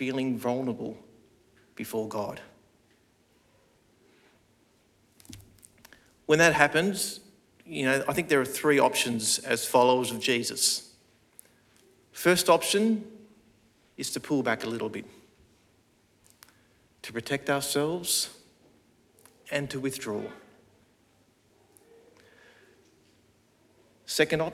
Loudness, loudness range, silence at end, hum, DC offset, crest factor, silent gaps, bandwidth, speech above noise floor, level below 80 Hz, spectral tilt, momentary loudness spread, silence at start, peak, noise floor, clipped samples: -27 LUFS; 15 LU; 0 s; none; under 0.1%; 28 dB; none; 17.5 kHz; 38 dB; -66 dBFS; -3 dB/octave; 20 LU; 0 s; -4 dBFS; -65 dBFS; under 0.1%